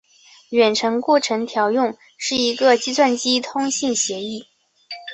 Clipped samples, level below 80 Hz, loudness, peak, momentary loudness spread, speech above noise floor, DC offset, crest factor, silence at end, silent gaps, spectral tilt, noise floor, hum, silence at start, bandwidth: under 0.1%; -64 dBFS; -19 LUFS; -2 dBFS; 11 LU; 20 dB; under 0.1%; 18 dB; 0 s; none; -2 dB/octave; -39 dBFS; none; 0.5 s; 8.4 kHz